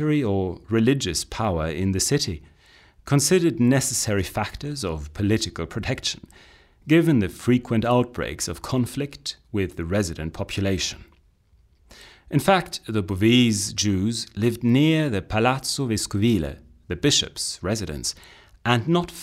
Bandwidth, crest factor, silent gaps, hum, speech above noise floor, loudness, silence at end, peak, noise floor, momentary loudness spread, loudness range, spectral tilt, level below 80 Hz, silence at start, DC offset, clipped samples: 16 kHz; 20 dB; none; none; 36 dB; -23 LUFS; 0 s; -4 dBFS; -59 dBFS; 10 LU; 5 LU; -4.5 dB/octave; -44 dBFS; 0 s; under 0.1%; under 0.1%